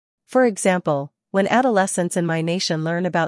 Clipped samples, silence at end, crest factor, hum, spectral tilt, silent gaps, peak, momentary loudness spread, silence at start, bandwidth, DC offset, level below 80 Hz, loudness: under 0.1%; 0 s; 16 dB; none; -5 dB/octave; none; -4 dBFS; 6 LU; 0.3 s; 12 kHz; under 0.1%; -70 dBFS; -20 LUFS